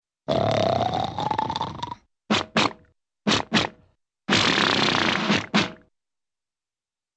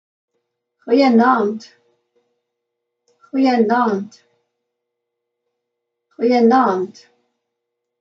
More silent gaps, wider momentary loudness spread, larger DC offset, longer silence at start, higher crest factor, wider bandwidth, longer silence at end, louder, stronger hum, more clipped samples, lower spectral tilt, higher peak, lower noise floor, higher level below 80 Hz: neither; about the same, 12 LU vs 13 LU; neither; second, 0.3 s vs 0.85 s; about the same, 22 dB vs 18 dB; first, 9 kHz vs 7.4 kHz; first, 1.4 s vs 1.1 s; second, -23 LUFS vs -16 LUFS; neither; neither; second, -4 dB/octave vs -6.5 dB/octave; about the same, -4 dBFS vs -2 dBFS; first, under -90 dBFS vs -78 dBFS; first, -54 dBFS vs -80 dBFS